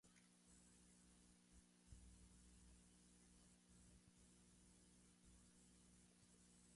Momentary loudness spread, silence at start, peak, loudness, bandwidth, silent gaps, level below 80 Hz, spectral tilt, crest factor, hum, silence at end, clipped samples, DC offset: 2 LU; 0.05 s; -50 dBFS; -69 LUFS; 11.5 kHz; none; -76 dBFS; -3.5 dB/octave; 20 dB; 60 Hz at -75 dBFS; 0 s; under 0.1%; under 0.1%